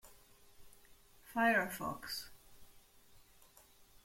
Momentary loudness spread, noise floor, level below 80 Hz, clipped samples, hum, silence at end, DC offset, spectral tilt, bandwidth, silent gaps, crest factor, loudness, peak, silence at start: 13 LU; -64 dBFS; -68 dBFS; under 0.1%; none; 0.9 s; under 0.1%; -3.5 dB/octave; 16.5 kHz; none; 22 dB; -36 LUFS; -20 dBFS; 0.05 s